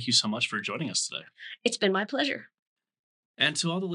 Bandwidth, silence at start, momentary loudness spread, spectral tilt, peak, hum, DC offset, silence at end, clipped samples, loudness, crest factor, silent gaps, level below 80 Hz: 11.5 kHz; 0 s; 10 LU; -2.5 dB/octave; -10 dBFS; none; under 0.1%; 0 s; under 0.1%; -28 LUFS; 20 dB; 2.59-2.76 s, 2.99-3.34 s; under -90 dBFS